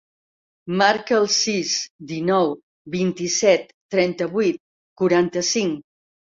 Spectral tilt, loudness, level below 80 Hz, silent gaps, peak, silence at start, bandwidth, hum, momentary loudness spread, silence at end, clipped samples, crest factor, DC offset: -3.5 dB/octave; -21 LUFS; -64 dBFS; 1.90-1.99 s, 2.63-2.85 s, 3.74-3.89 s, 4.60-4.96 s; -2 dBFS; 0.65 s; 7.8 kHz; none; 12 LU; 0.5 s; under 0.1%; 20 dB; under 0.1%